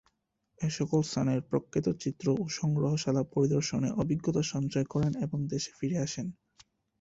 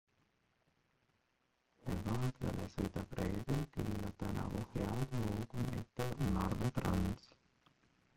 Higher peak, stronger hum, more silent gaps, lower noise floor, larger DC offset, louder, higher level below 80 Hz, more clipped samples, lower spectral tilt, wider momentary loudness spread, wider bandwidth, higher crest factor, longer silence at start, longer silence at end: first, -16 dBFS vs -22 dBFS; neither; neither; about the same, -78 dBFS vs -80 dBFS; neither; first, -31 LUFS vs -40 LUFS; second, -60 dBFS vs -52 dBFS; neither; about the same, -6 dB/octave vs -7 dB/octave; about the same, 5 LU vs 6 LU; second, 8 kHz vs 16.5 kHz; about the same, 16 dB vs 20 dB; second, 0.6 s vs 1.8 s; second, 0.7 s vs 0.95 s